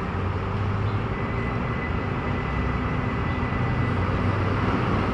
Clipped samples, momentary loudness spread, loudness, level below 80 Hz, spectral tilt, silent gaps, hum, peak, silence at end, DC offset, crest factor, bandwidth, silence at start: under 0.1%; 3 LU; -26 LUFS; -34 dBFS; -8 dB/octave; none; none; -12 dBFS; 0 s; under 0.1%; 12 dB; 7.6 kHz; 0 s